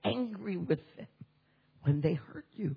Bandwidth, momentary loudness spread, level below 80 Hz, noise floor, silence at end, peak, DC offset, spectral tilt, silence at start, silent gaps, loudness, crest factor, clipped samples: 5.2 kHz; 20 LU; -68 dBFS; -70 dBFS; 0 s; -16 dBFS; under 0.1%; -10.5 dB/octave; 0 s; none; -34 LUFS; 18 dB; under 0.1%